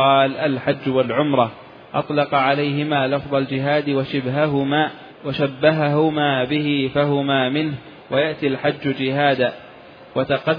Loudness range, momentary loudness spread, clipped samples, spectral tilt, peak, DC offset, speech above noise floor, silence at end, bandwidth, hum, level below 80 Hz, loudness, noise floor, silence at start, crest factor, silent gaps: 1 LU; 7 LU; under 0.1%; -9 dB/octave; -2 dBFS; under 0.1%; 23 dB; 0 s; 5.2 kHz; none; -58 dBFS; -20 LUFS; -42 dBFS; 0 s; 18 dB; none